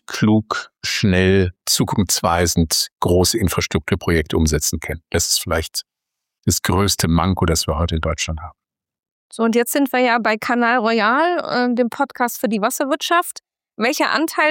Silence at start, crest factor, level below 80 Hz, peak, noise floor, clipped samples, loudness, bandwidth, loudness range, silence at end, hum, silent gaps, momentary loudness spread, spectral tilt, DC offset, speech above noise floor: 0.1 s; 16 dB; -36 dBFS; -2 dBFS; -82 dBFS; under 0.1%; -18 LUFS; 17 kHz; 3 LU; 0 s; none; 2.92-2.96 s, 6.39-6.43 s, 9.11-9.30 s; 7 LU; -4 dB/octave; under 0.1%; 64 dB